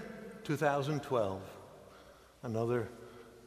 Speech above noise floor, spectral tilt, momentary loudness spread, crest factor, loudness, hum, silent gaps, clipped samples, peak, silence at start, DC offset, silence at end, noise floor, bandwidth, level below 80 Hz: 24 dB; -6.5 dB/octave; 23 LU; 22 dB; -36 LUFS; none; none; under 0.1%; -16 dBFS; 0 s; under 0.1%; 0 s; -58 dBFS; 15.5 kHz; -68 dBFS